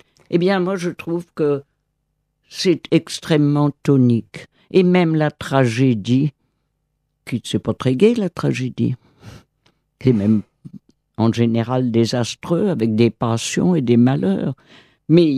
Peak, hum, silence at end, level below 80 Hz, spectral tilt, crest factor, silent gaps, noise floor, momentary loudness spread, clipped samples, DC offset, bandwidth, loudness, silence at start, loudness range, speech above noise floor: -2 dBFS; none; 0 s; -56 dBFS; -6.5 dB/octave; 16 dB; none; -71 dBFS; 9 LU; under 0.1%; under 0.1%; 13 kHz; -18 LUFS; 0.3 s; 4 LU; 54 dB